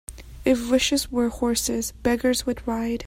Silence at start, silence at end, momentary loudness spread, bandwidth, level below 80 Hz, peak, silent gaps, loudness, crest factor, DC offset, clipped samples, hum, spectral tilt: 0.1 s; 0 s; 6 LU; 16 kHz; -42 dBFS; -8 dBFS; none; -23 LUFS; 16 dB; under 0.1%; under 0.1%; none; -3 dB/octave